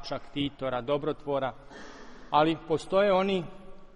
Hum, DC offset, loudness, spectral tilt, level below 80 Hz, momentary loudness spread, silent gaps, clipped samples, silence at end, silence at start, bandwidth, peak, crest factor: none; under 0.1%; -29 LUFS; -6 dB/octave; -54 dBFS; 22 LU; none; under 0.1%; 0 s; 0 s; 11 kHz; -10 dBFS; 20 dB